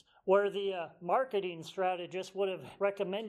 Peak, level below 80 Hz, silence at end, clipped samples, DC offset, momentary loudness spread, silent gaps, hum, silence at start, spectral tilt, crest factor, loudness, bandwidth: -14 dBFS; -82 dBFS; 0 s; under 0.1%; under 0.1%; 9 LU; none; none; 0.25 s; -5.5 dB/octave; 20 dB; -34 LUFS; 12 kHz